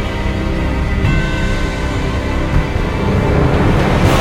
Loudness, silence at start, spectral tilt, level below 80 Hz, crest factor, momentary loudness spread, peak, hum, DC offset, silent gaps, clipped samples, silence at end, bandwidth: -16 LUFS; 0 s; -6.5 dB/octave; -18 dBFS; 14 dB; 6 LU; 0 dBFS; none; under 0.1%; none; under 0.1%; 0 s; 16.5 kHz